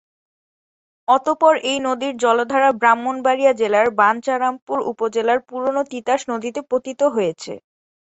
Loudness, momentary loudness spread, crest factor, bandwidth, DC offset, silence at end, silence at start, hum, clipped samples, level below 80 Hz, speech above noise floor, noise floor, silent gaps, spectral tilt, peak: -18 LUFS; 9 LU; 18 dB; 8.2 kHz; under 0.1%; 0.6 s; 1.1 s; none; under 0.1%; -66 dBFS; over 72 dB; under -90 dBFS; 4.62-4.67 s; -3.5 dB/octave; -2 dBFS